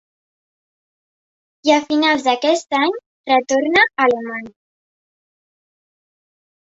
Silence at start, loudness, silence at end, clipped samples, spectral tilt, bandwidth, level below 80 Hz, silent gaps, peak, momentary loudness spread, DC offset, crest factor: 1.65 s; -16 LUFS; 2.25 s; under 0.1%; -2 dB/octave; 8 kHz; -64 dBFS; 3.06-3.24 s; -2 dBFS; 9 LU; under 0.1%; 18 dB